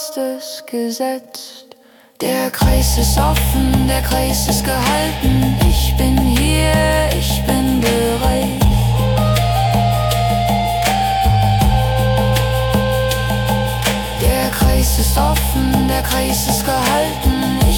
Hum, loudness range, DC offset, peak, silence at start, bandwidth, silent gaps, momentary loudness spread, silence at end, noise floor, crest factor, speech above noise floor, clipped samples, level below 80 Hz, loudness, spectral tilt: none; 2 LU; under 0.1%; -4 dBFS; 0 s; 19 kHz; none; 5 LU; 0 s; -45 dBFS; 12 dB; 30 dB; under 0.1%; -20 dBFS; -15 LUFS; -5 dB/octave